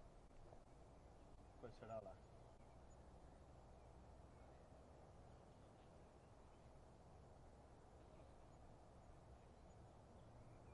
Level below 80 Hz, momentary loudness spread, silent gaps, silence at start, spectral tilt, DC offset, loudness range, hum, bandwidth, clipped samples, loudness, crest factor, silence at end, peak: -68 dBFS; 5 LU; none; 0 s; -6.5 dB/octave; under 0.1%; 4 LU; none; 10.5 kHz; under 0.1%; -65 LUFS; 22 dB; 0 s; -42 dBFS